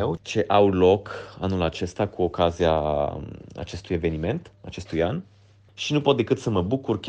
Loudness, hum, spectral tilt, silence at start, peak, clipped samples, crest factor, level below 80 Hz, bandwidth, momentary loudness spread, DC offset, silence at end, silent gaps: -24 LUFS; none; -6.5 dB/octave; 0 s; -6 dBFS; under 0.1%; 18 dB; -44 dBFS; 9 kHz; 16 LU; under 0.1%; 0 s; none